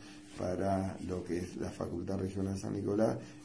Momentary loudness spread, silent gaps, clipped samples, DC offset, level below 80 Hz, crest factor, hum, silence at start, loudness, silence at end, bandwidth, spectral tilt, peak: 8 LU; none; under 0.1%; under 0.1%; -62 dBFS; 18 dB; none; 0 s; -36 LUFS; 0 s; 11 kHz; -7 dB/octave; -18 dBFS